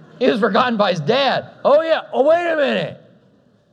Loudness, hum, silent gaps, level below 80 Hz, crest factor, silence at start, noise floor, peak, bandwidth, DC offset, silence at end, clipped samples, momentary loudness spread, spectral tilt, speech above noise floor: -17 LUFS; none; none; -70 dBFS; 18 dB; 0.2 s; -55 dBFS; 0 dBFS; 8.8 kHz; under 0.1%; 0.75 s; under 0.1%; 4 LU; -6 dB/octave; 38 dB